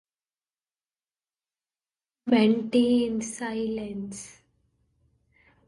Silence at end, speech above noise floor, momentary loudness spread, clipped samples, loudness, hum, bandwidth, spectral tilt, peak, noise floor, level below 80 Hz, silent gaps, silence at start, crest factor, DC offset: 1.35 s; over 65 dB; 17 LU; under 0.1%; -25 LUFS; none; 11.5 kHz; -5 dB/octave; -8 dBFS; under -90 dBFS; -64 dBFS; none; 2.25 s; 20 dB; under 0.1%